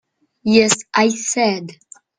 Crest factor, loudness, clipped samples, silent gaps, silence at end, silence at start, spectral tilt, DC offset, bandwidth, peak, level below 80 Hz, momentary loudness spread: 18 dB; -16 LUFS; under 0.1%; none; 0.45 s; 0.45 s; -3 dB/octave; under 0.1%; 10 kHz; 0 dBFS; -58 dBFS; 13 LU